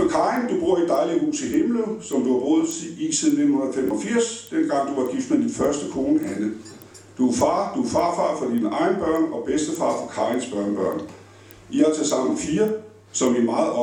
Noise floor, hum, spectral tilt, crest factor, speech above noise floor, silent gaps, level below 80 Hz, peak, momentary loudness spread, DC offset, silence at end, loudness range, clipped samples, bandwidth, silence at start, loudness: -46 dBFS; none; -4.5 dB/octave; 16 dB; 24 dB; none; -56 dBFS; -6 dBFS; 7 LU; under 0.1%; 0 s; 2 LU; under 0.1%; 18 kHz; 0 s; -22 LUFS